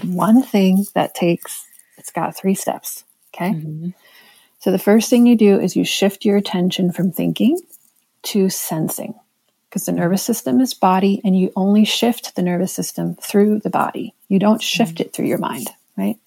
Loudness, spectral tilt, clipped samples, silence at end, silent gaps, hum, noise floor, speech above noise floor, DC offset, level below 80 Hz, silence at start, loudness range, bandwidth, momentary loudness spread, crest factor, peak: -17 LUFS; -5.5 dB/octave; under 0.1%; 0.15 s; none; none; -66 dBFS; 49 dB; under 0.1%; -72 dBFS; 0 s; 6 LU; 17 kHz; 14 LU; 16 dB; -2 dBFS